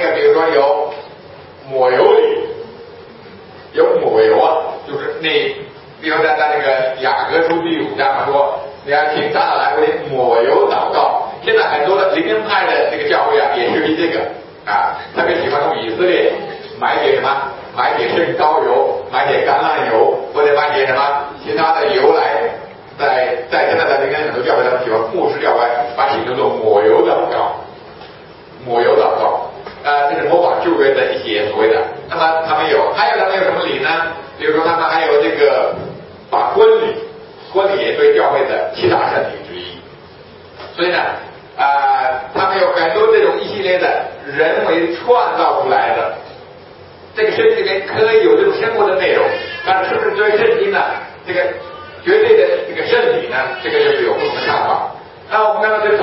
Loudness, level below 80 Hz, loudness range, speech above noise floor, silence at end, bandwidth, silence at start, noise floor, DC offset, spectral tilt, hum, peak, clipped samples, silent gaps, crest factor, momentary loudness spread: -14 LUFS; -56 dBFS; 2 LU; 24 dB; 0 s; 5.8 kHz; 0 s; -38 dBFS; under 0.1%; -8.5 dB/octave; none; 0 dBFS; under 0.1%; none; 14 dB; 11 LU